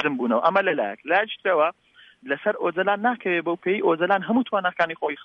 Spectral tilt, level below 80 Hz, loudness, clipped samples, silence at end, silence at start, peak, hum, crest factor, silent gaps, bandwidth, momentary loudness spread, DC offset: -7.5 dB/octave; -74 dBFS; -23 LUFS; under 0.1%; 0 s; 0 s; -6 dBFS; none; 16 dB; none; 6.2 kHz; 5 LU; under 0.1%